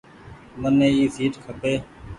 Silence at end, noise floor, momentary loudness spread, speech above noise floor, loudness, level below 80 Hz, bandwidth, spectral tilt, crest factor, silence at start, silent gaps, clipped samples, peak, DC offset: 0 s; -44 dBFS; 11 LU; 23 dB; -22 LUFS; -48 dBFS; 11 kHz; -6.5 dB/octave; 16 dB; 0.25 s; none; under 0.1%; -8 dBFS; under 0.1%